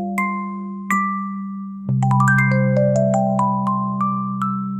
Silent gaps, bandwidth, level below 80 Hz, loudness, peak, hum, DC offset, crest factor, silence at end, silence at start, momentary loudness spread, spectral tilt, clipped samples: none; 14.5 kHz; -54 dBFS; -19 LUFS; -4 dBFS; none; under 0.1%; 14 dB; 0 s; 0 s; 13 LU; -8 dB/octave; under 0.1%